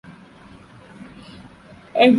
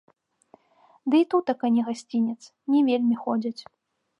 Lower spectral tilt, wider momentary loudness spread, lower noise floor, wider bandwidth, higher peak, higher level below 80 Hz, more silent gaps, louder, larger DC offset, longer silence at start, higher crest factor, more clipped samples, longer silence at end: about the same, -6.5 dB/octave vs -6 dB/octave; first, 19 LU vs 13 LU; second, -45 dBFS vs -60 dBFS; about the same, 10.5 kHz vs 10.5 kHz; first, -2 dBFS vs -10 dBFS; first, -58 dBFS vs -80 dBFS; neither; first, -19 LUFS vs -24 LUFS; neither; about the same, 1 s vs 1.05 s; about the same, 20 dB vs 16 dB; neither; second, 0 s vs 0.6 s